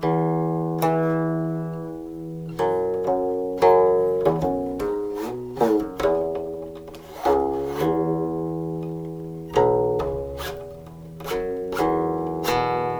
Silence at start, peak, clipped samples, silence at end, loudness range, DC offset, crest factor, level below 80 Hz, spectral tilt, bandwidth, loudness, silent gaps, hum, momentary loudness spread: 0 s; -4 dBFS; under 0.1%; 0 s; 4 LU; under 0.1%; 18 dB; -46 dBFS; -7 dB/octave; over 20 kHz; -24 LUFS; none; none; 14 LU